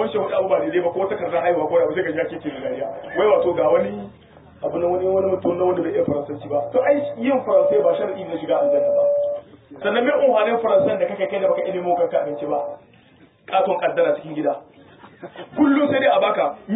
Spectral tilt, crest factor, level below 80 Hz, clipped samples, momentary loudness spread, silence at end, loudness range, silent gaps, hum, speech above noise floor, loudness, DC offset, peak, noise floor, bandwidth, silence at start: -10.5 dB/octave; 14 dB; -58 dBFS; under 0.1%; 10 LU; 0 s; 3 LU; none; none; 32 dB; -20 LUFS; under 0.1%; -6 dBFS; -52 dBFS; 4 kHz; 0 s